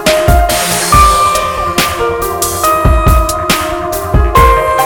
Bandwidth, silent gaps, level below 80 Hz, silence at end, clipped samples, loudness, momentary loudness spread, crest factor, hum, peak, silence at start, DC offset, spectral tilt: 19.5 kHz; none; -16 dBFS; 0 s; 0.3%; -10 LUFS; 7 LU; 10 dB; none; 0 dBFS; 0 s; under 0.1%; -4 dB/octave